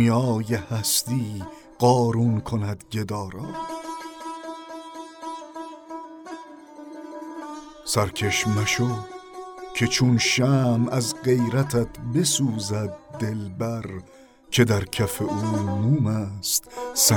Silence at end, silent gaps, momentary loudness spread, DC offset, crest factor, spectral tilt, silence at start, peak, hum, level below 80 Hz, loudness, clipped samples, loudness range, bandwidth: 0 s; none; 19 LU; under 0.1%; 20 dB; -4.5 dB/octave; 0 s; -4 dBFS; none; -54 dBFS; -23 LUFS; under 0.1%; 14 LU; 19.5 kHz